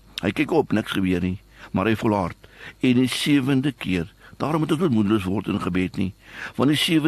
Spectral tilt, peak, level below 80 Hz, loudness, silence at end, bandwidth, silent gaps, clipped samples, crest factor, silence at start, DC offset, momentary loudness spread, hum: -6 dB/octave; -6 dBFS; -50 dBFS; -23 LUFS; 0 s; 13 kHz; none; under 0.1%; 16 dB; 0.15 s; under 0.1%; 11 LU; none